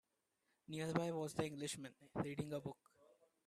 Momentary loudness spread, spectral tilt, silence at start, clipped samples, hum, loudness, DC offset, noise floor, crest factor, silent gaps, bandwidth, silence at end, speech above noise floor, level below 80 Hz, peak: 10 LU; -5.5 dB/octave; 0.7 s; under 0.1%; none; -45 LUFS; under 0.1%; -86 dBFS; 22 dB; none; 14.5 kHz; 0.4 s; 41 dB; -76 dBFS; -24 dBFS